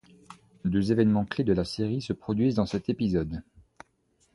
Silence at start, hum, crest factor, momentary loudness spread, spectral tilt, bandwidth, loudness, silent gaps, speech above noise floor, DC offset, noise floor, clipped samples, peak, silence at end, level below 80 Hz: 0.3 s; none; 18 dB; 8 LU; -7.5 dB/octave; 11.5 kHz; -27 LUFS; none; 43 dB; under 0.1%; -69 dBFS; under 0.1%; -10 dBFS; 0.95 s; -50 dBFS